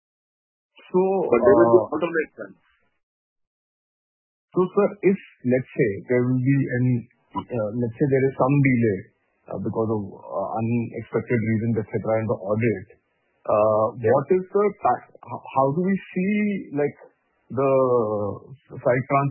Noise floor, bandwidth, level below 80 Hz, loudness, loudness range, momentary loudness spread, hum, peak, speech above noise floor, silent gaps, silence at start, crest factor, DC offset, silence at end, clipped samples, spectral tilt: under -90 dBFS; 3.2 kHz; -58 dBFS; -23 LUFS; 4 LU; 12 LU; none; -2 dBFS; over 68 dB; 3.03-3.36 s, 3.47-4.48 s; 0.95 s; 20 dB; under 0.1%; 0 s; under 0.1%; -13 dB/octave